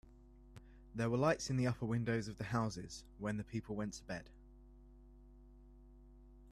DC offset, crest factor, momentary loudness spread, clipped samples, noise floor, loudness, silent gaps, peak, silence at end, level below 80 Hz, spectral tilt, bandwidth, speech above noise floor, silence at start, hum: under 0.1%; 20 dB; 25 LU; under 0.1%; -61 dBFS; -40 LUFS; none; -22 dBFS; 0 s; -60 dBFS; -6 dB/octave; 12.5 kHz; 22 dB; 0.05 s; 50 Hz at -60 dBFS